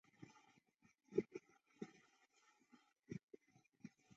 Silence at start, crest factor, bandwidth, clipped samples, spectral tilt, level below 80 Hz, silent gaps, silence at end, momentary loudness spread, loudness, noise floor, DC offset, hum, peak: 0.2 s; 30 dB; 7.6 kHz; under 0.1%; -7.5 dB/octave; -88 dBFS; 3.23-3.28 s; 0.3 s; 20 LU; -51 LUFS; -78 dBFS; under 0.1%; none; -26 dBFS